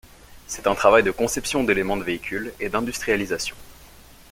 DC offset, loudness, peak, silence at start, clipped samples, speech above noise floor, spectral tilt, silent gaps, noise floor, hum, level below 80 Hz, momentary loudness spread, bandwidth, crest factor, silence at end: under 0.1%; -22 LUFS; -2 dBFS; 0.05 s; under 0.1%; 25 dB; -3.5 dB/octave; none; -47 dBFS; none; -46 dBFS; 12 LU; 17 kHz; 22 dB; 0.45 s